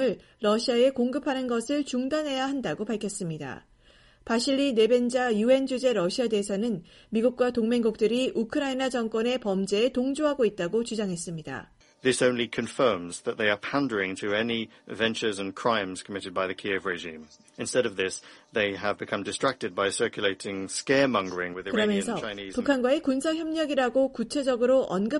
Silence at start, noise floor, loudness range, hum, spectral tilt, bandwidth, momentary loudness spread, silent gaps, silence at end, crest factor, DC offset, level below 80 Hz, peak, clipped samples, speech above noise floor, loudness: 0 s; -58 dBFS; 4 LU; none; -4 dB/octave; 11.5 kHz; 9 LU; none; 0 s; 18 dB; under 0.1%; -62 dBFS; -10 dBFS; under 0.1%; 31 dB; -27 LUFS